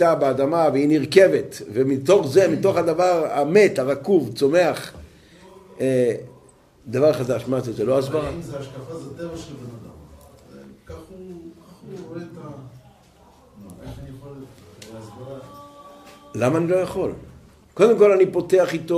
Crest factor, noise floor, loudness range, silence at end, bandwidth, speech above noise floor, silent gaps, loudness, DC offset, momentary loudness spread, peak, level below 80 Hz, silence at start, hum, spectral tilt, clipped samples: 20 dB; -52 dBFS; 22 LU; 0 s; 15 kHz; 33 dB; none; -19 LUFS; under 0.1%; 24 LU; -2 dBFS; -54 dBFS; 0 s; none; -6 dB/octave; under 0.1%